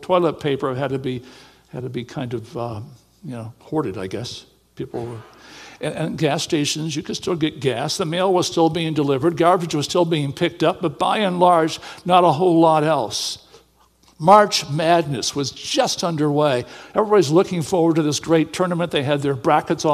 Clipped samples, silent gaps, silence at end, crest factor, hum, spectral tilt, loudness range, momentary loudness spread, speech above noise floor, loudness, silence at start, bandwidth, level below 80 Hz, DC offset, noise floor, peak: under 0.1%; none; 0 s; 20 dB; none; -5 dB/octave; 12 LU; 15 LU; 36 dB; -19 LUFS; 0 s; 14.5 kHz; -58 dBFS; under 0.1%; -56 dBFS; 0 dBFS